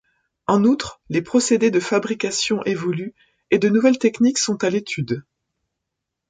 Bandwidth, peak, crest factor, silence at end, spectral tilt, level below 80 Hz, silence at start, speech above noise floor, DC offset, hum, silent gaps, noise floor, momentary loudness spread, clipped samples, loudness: 9.6 kHz; -4 dBFS; 16 dB; 1.1 s; -4.5 dB/octave; -60 dBFS; 0.5 s; 62 dB; under 0.1%; none; none; -81 dBFS; 9 LU; under 0.1%; -20 LUFS